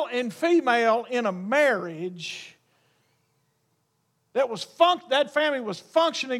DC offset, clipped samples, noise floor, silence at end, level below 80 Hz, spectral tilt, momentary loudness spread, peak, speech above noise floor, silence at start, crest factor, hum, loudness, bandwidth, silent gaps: under 0.1%; under 0.1%; -72 dBFS; 0 s; -84 dBFS; -4 dB/octave; 12 LU; -6 dBFS; 48 dB; 0 s; 20 dB; none; -24 LUFS; 14.5 kHz; none